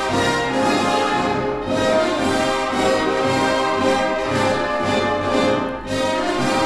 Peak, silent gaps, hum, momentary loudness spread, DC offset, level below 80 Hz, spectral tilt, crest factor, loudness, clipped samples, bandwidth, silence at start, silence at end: -6 dBFS; none; none; 3 LU; under 0.1%; -44 dBFS; -4.5 dB/octave; 14 dB; -19 LUFS; under 0.1%; 15.5 kHz; 0 s; 0 s